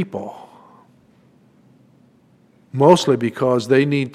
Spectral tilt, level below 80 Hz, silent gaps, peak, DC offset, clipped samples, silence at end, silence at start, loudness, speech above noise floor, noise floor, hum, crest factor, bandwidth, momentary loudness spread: -6 dB/octave; -64 dBFS; none; 0 dBFS; under 0.1%; under 0.1%; 0.05 s; 0 s; -16 LUFS; 38 dB; -54 dBFS; none; 20 dB; 15 kHz; 18 LU